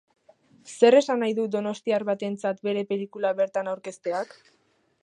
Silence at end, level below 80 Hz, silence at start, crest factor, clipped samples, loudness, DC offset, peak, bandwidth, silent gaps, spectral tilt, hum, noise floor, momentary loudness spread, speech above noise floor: 0.8 s; -80 dBFS; 0.65 s; 22 dB; under 0.1%; -25 LUFS; under 0.1%; -4 dBFS; 11 kHz; none; -5 dB/octave; none; -58 dBFS; 14 LU; 34 dB